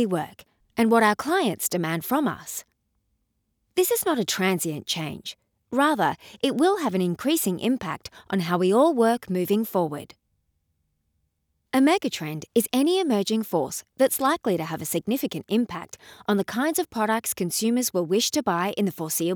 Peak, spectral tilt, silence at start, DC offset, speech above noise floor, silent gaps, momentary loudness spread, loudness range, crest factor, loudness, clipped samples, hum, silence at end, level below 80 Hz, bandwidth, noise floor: -8 dBFS; -4 dB/octave; 0 s; under 0.1%; 50 dB; none; 10 LU; 3 LU; 18 dB; -24 LUFS; under 0.1%; none; 0 s; -66 dBFS; over 20 kHz; -74 dBFS